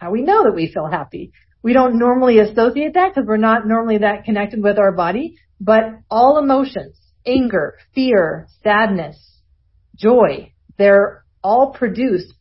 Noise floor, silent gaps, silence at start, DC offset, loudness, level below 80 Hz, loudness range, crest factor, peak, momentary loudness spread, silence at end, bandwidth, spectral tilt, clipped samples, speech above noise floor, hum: -56 dBFS; none; 0 s; under 0.1%; -15 LUFS; -48 dBFS; 3 LU; 16 dB; 0 dBFS; 12 LU; 0.15 s; 5.8 kHz; -11 dB/octave; under 0.1%; 41 dB; none